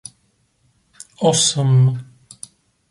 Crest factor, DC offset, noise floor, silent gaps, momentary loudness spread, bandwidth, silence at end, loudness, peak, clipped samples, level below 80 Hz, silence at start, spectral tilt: 16 dB; under 0.1%; -63 dBFS; none; 24 LU; 11.5 kHz; 0.85 s; -16 LUFS; -4 dBFS; under 0.1%; -60 dBFS; 1.2 s; -4.5 dB/octave